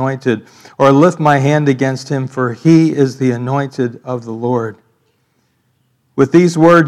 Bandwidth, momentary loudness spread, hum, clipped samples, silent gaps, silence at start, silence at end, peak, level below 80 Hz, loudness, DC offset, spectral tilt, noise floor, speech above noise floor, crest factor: 11.5 kHz; 11 LU; none; 0.4%; none; 0 s; 0 s; 0 dBFS; -60 dBFS; -13 LUFS; under 0.1%; -7 dB/octave; -61 dBFS; 48 dB; 14 dB